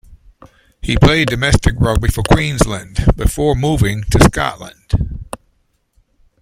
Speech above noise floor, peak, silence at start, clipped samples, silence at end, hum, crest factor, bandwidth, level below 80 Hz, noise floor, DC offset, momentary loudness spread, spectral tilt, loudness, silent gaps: 47 dB; 0 dBFS; 0.1 s; under 0.1%; 1.05 s; none; 16 dB; 16.5 kHz; -22 dBFS; -61 dBFS; under 0.1%; 14 LU; -5.5 dB/octave; -15 LUFS; none